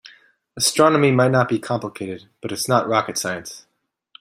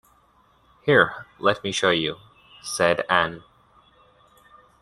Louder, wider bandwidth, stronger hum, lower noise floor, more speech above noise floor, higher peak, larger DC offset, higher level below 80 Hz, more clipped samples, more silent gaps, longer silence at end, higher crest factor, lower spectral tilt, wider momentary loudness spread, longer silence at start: first, -19 LUFS vs -22 LUFS; first, 16 kHz vs 12.5 kHz; neither; second, -52 dBFS vs -60 dBFS; second, 33 dB vs 38 dB; about the same, -2 dBFS vs -2 dBFS; neither; about the same, -62 dBFS vs -60 dBFS; neither; neither; second, 0.6 s vs 1.4 s; about the same, 20 dB vs 24 dB; about the same, -4.5 dB/octave vs -3.5 dB/octave; about the same, 16 LU vs 15 LU; second, 0.55 s vs 0.85 s